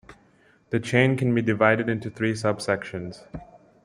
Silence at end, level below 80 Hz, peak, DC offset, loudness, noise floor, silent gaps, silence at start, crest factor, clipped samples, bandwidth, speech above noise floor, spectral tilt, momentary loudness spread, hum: 0.4 s; -58 dBFS; -4 dBFS; under 0.1%; -24 LUFS; -59 dBFS; none; 0.1 s; 22 dB; under 0.1%; 11.5 kHz; 35 dB; -6.5 dB/octave; 17 LU; none